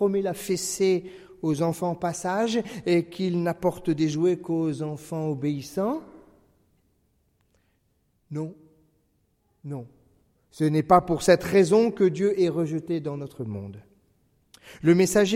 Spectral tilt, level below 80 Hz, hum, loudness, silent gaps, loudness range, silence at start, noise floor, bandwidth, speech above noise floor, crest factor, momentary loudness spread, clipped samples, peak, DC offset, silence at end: -6 dB/octave; -58 dBFS; none; -25 LUFS; none; 19 LU; 0 s; -69 dBFS; 16 kHz; 45 dB; 22 dB; 15 LU; under 0.1%; -4 dBFS; under 0.1%; 0 s